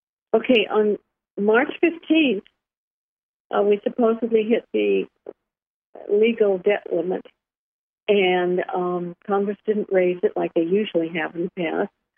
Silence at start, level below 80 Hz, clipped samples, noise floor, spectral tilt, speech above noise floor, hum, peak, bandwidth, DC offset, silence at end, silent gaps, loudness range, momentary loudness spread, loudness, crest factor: 0.35 s; -74 dBFS; under 0.1%; -89 dBFS; -9 dB/octave; 68 dB; none; -4 dBFS; 3.6 kHz; under 0.1%; 0.3 s; 1.30-1.35 s, 2.77-3.50 s, 5.67-5.93 s, 7.57-8.06 s; 2 LU; 9 LU; -22 LUFS; 18 dB